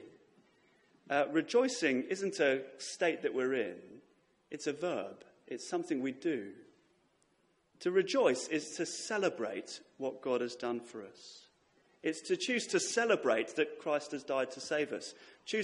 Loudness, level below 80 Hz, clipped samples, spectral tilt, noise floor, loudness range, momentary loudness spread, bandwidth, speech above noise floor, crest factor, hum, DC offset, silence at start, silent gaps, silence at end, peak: -35 LUFS; -84 dBFS; under 0.1%; -3.5 dB/octave; -74 dBFS; 6 LU; 15 LU; 11.5 kHz; 39 dB; 20 dB; none; under 0.1%; 0 s; none; 0 s; -16 dBFS